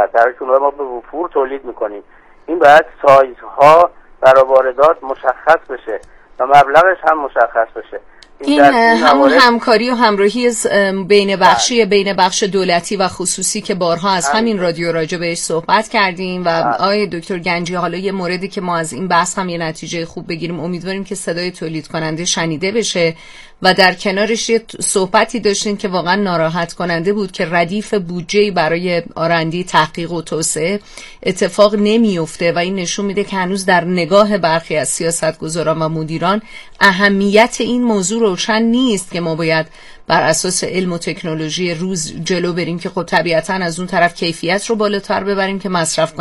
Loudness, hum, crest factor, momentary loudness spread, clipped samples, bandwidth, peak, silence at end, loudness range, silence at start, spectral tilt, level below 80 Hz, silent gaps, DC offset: -14 LUFS; none; 14 dB; 12 LU; 0.4%; 14 kHz; 0 dBFS; 0 s; 7 LU; 0 s; -4 dB/octave; -46 dBFS; none; under 0.1%